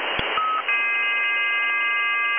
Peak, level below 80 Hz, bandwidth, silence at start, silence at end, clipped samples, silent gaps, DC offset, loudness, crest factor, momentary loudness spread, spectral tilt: -6 dBFS; -54 dBFS; 3.7 kHz; 0 s; 0 s; under 0.1%; none; under 0.1%; -20 LUFS; 18 dB; 3 LU; -4.5 dB/octave